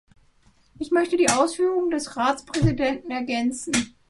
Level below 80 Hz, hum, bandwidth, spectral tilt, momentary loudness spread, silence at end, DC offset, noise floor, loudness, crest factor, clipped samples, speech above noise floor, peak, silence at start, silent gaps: -44 dBFS; none; 11.5 kHz; -4.5 dB/octave; 6 LU; 0.2 s; under 0.1%; -59 dBFS; -23 LUFS; 20 dB; under 0.1%; 36 dB; -4 dBFS; 0.8 s; none